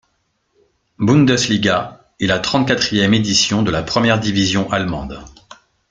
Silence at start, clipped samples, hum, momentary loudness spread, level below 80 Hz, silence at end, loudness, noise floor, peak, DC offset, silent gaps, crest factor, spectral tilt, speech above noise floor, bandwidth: 1 s; under 0.1%; none; 10 LU; -42 dBFS; 0.65 s; -16 LUFS; -66 dBFS; 0 dBFS; under 0.1%; none; 16 dB; -4.5 dB/octave; 51 dB; 9.4 kHz